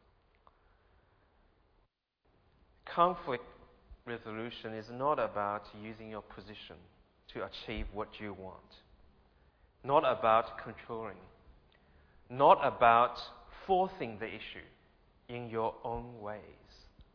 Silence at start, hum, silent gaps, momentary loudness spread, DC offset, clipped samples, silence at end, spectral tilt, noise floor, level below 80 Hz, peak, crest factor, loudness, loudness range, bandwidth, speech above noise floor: 2.85 s; none; none; 23 LU; under 0.1%; under 0.1%; 0.1 s; -3.5 dB/octave; -76 dBFS; -58 dBFS; -10 dBFS; 26 dB; -33 LUFS; 14 LU; 5.4 kHz; 42 dB